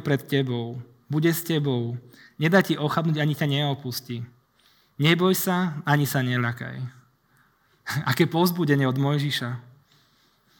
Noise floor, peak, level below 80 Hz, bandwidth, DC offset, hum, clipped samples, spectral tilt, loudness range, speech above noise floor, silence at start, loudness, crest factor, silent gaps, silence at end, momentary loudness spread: -63 dBFS; -4 dBFS; -70 dBFS; over 20 kHz; under 0.1%; none; under 0.1%; -5.5 dB/octave; 1 LU; 39 dB; 0 s; -24 LUFS; 22 dB; none; 1 s; 15 LU